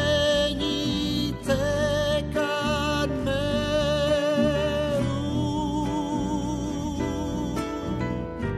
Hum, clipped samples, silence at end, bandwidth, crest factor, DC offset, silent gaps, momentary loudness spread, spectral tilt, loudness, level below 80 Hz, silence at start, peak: none; under 0.1%; 0 s; 14 kHz; 14 dB; under 0.1%; none; 6 LU; -5.5 dB/octave; -26 LUFS; -40 dBFS; 0 s; -10 dBFS